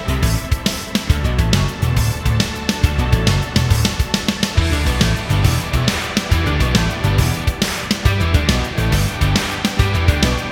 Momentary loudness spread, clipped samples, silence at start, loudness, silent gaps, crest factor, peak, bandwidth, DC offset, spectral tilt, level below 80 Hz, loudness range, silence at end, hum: 3 LU; under 0.1%; 0 s; -17 LUFS; none; 16 dB; 0 dBFS; 18.5 kHz; under 0.1%; -5 dB/octave; -22 dBFS; 1 LU; 0 s; none